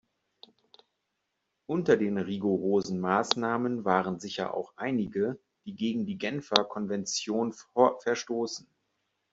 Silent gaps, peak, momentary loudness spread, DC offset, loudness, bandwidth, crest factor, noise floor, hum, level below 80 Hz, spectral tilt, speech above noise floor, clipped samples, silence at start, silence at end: none; -2 dBFS; 8 LU; under 0.1%; -29 LUFS; 8 kHz; 28 dB; -81 dBFS; none; -70 dBFS; -4.5 dB/octave; 52 dB; under 0.1%; 1.7 s; 0.75 s